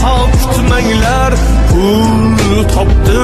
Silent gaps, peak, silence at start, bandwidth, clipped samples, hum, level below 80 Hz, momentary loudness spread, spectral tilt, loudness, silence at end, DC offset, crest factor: none; 0 dBFS; 0 s; 14 kHz; under 0.1%; none; -12 dBFS; 1 LU; -6 dB/octave; -10 LUFS; 0 s; under 0.1%; 8 dB